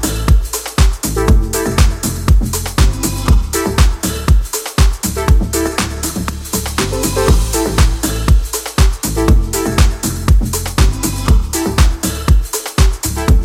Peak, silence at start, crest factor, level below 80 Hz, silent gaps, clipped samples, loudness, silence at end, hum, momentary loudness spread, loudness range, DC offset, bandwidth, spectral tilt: 0 dBFS; 0 s; 12 dB; -14 dBFS; none; under 0.1%; -15 LUFS; 0 s; none; 4 LU; 1 LU; under 0.1%; 16.5 kHz; -4.5 dB/octave